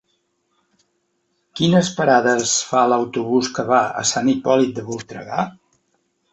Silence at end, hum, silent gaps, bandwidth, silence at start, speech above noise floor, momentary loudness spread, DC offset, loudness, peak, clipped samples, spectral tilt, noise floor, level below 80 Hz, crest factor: 0.8 s; none; none; 8.2 kHz; 1.55 s; 51 dB; 12 LU; under 0.1%; -18 LUFS; -2 dBFS; under 0.1%; -4 dB/octave; -69 dBFS; -60 dBFS; 18 dB